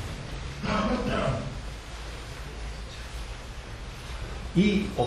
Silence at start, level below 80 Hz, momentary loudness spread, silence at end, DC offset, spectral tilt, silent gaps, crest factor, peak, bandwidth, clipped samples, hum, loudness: 0 s; -38 dBFS; 15 LU; 0 s; under 0.1%; -6 dB/octave; none; 20 dB; -12 dBFS; 12.5 kHz; under 0.1%; none; -31 LUFS